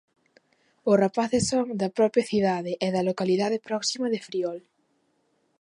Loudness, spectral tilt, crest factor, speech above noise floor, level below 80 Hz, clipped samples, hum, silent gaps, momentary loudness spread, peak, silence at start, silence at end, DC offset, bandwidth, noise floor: -25 LUFS; -5 dB/octave; 18 dB; 45 dB; -62 dBFS; under 0.1%; none; none; 8 LU; -8 dBFS; 0.85 s; 1 s; under 0.1%; 11.5 kHz; -70 dBFS